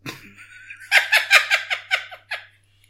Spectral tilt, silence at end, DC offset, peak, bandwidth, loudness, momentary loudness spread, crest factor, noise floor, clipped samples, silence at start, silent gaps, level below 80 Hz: 0.5 dB/octave; 0.5 s; under 0.1%; 0 dBFS; 16.5 kHz; -17 LUFS; 19 LU; 22 dB; -50 dBFS; under 0.1%; 0.05 s; none; -68 dBFS